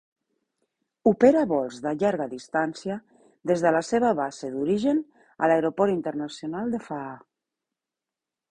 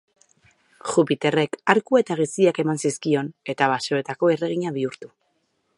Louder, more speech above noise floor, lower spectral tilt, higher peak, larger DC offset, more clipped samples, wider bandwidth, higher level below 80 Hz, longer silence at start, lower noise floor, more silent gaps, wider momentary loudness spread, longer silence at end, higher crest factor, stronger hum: second, -25 LUFS vs -22 LUFS; first, 65 dB vs 48 dB; first, -6.5 dB/octave vs -5 dB/octave; second, -4 dBFS vs 0 dBFS; neither; neither; about the same, 11 kHz vs 11.5 kHz; first, -64 dBFS vs -70 dBFS; first, 1.05 s vs 0.85 s; first, -89 dBFS vs -70 dBFS; neither; first, 15 LU vs 8 LU; first, 1.35 s vs 0.7 s; about the same, 22 dB vs 22 dB; neither